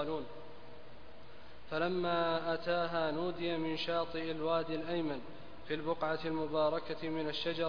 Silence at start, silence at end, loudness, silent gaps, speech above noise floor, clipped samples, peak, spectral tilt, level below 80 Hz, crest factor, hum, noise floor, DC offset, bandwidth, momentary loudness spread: 0 s; 0 s; -36 LUFS; none; 20 dB; under 0.1%; -20 dBFS; -3.5 dB/octave; -64 dBFS; 16 dB; 60 Hz at -65 dBFS; -56 dBFS; 0.6%; 5.2 kHz; 21 LU